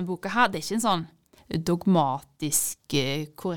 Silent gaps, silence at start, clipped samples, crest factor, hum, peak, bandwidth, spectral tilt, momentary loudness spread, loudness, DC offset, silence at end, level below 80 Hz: none; 0 s; under 0.1%; 18 dB; none; -8 dBFS; 19 kHz; -4 dB/octave; 8 LU; -26 LUFS; 0.5%; 0 s; -58 dBFS